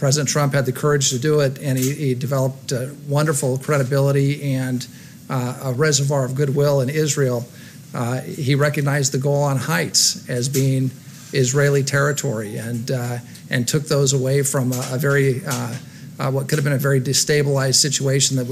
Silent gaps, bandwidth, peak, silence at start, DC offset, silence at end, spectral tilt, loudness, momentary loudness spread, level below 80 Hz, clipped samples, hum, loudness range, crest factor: none; 15.5 kHz; -4 dBFS; 0 s; under 0.1%; 0 s; -4.5 dB/octave; -19 LUFS; 10 LU; -58 dBFS; under 0.1%; none; 2 LU; 16 dB